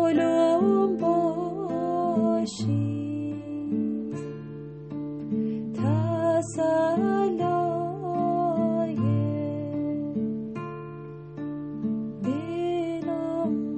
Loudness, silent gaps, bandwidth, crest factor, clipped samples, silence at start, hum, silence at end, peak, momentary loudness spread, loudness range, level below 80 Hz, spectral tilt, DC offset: -27 LUFS; none; 8.4 kHz; 14 dB; under 0.1%; 0 s; none; 0 s; -12 dBFS; 12 LU; 6 LU; -66 dBFS; -8 dB/octave; under 0.1%